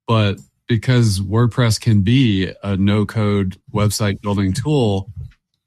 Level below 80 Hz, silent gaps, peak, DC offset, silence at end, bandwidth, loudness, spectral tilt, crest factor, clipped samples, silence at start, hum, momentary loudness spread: -44 dBFS; none; -4 dBFS; under 0.1%; 0.4 s; 13.5 kHz; -18 LUFS; -6 dB/octave; 14 dB; under 0.1%; 0.1 s; none; 7 LU